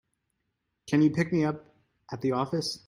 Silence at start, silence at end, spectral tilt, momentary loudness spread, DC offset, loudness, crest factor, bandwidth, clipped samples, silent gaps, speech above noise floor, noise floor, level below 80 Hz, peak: 0.85 s; 0.1 s; -6 dB/octave; 12 LU; under 0.1%; -27 LUFS; 18 dB; 12 kHz; under 0.1%; none; 53 dB; -80 dBFS; -66 dBFS; -12 dBFS